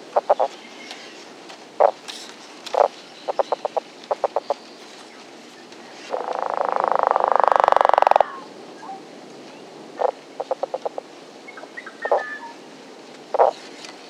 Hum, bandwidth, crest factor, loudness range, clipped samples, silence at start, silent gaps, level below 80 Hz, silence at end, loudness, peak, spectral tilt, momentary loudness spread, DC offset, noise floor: none; 13 kHz; 24 dB; 10 LU; under 0.1%; 0 s; none; -70 dBFS; 0 s; -22 LUFS; 0 dBFS; -2.5 dB/octave; 24 LU; under 0.1%; -42 dBFS